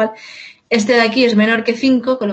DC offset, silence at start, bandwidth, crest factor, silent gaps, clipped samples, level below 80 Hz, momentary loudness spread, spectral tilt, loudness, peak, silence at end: under 0.1%; 0 s; 8.6 kHz; 14 dB; none; under 0.1%; -62 dBFS; 11 LU; -5 dB/octave; -14 LUFS; -2 dBFS; 0 s